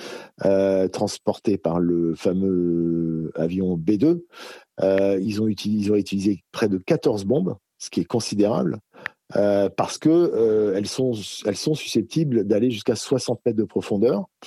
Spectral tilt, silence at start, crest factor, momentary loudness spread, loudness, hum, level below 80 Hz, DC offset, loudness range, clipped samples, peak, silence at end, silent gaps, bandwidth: -6 dB/octave; 0 s; 14 dB; 7 LU; -22 LUFS; none; -60 dBFS; under 0.1%; 2 LU; under 0.1%; -8 dBFS; 0 s; none; 13.5 kHz